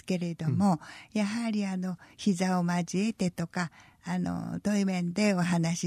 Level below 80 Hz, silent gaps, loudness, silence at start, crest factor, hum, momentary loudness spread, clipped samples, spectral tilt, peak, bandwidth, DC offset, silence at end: -66 dBFS; none; -30 LUFS; 0.05 s; 14 dB; none; 8 LU; under 0.1%; -6 dB/octave; -14 dBFS; 14 kHz; under 0.1%; 0 s